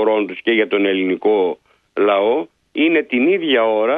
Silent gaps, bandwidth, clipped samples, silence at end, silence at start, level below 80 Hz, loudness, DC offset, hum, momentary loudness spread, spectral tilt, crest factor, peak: none; 4.4 kHz; under 0.1%; 0 s; 0 s; -68 dBFS; -17 LUFS; under 0.1%; none; 7 LU; -7.5 dB/octave; 14 dB; -4 dBFS